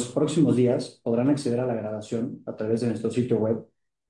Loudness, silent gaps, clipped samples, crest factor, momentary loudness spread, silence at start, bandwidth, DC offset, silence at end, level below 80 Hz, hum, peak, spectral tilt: -25 LUFS; none; under 0.1%; 16 dB; 10 LU; 0 s; 11.5 kHz; under 0.1%; 0.45 s; -68 dBFS; none; -10 dBFS; -7 dB/octave